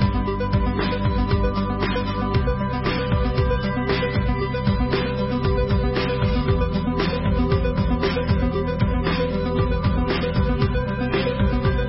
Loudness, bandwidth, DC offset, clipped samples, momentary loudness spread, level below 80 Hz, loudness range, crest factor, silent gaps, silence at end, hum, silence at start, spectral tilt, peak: -22 LUFS; 5.8 kHz; under 0.1%; under 0.1%; 2 LU; -26 dBFS; 1 LU; 14 dB; none; 0 s; none; 0 s; -11 dB/octave; -8 dBFS